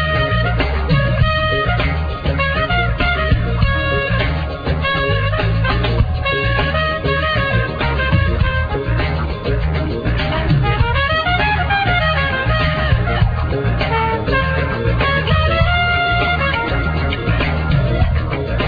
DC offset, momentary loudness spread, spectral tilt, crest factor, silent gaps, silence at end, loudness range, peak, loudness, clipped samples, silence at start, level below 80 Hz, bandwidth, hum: under 0.1%; 4 LU; -8.5 dB/octave; 14 dB; none; 0 s; 2 LU; -2 dBFS; -17 LUFS; under 0.1%; 0 s; -22 dBFS; 5 kHz; none